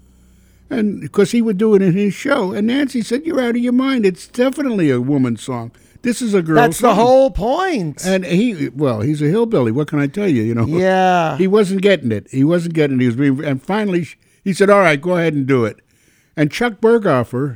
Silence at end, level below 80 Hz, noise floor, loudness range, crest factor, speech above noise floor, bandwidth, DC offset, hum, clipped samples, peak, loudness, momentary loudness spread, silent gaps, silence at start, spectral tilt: 0 s; -44 dBFS; -55 dBFS; 2 LU; 16 dB; 40 dB; 19 kHz; under 0.1%; none; under 0.1%; 0 dBFS; -16 LUFS; 7 LU; none; 0.7 s; -6.5 dB/octave